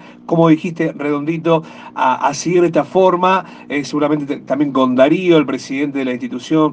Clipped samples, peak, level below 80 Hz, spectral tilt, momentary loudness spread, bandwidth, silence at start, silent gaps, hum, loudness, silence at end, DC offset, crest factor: under 0.1%; 0 dBFS; -62 dBFS; -6 dB/octave; 8 LU; 9 kHz; 0 s; none; none; -16 LUFS; 0 s; under 0.1%; 16 dB